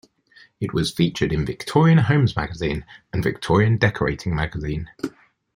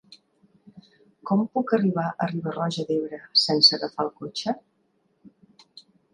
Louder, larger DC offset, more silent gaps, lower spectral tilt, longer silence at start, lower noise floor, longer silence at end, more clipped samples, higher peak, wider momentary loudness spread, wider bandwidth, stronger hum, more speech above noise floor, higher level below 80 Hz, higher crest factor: about the same, -21 LUFS vs -23 LUFS; neither; neither; first, -7 dB/octave vs -5 dB/octave; first, 0.6 s vs 0.1 s; second, -53 dBFS vs -69 dBFS; about the same, 0.45 s vs 0.35 s; neither; about the same, -2 dBFS vs -4 dBFS; about the same, 14 LU vs 14 LU; first, 15.5 kHz vs 11 kHz; neither; second, 33 dB vs 45 dB; first, -40 dBFS vs -72 dBFS; about the same, 18 dB vs 22 dB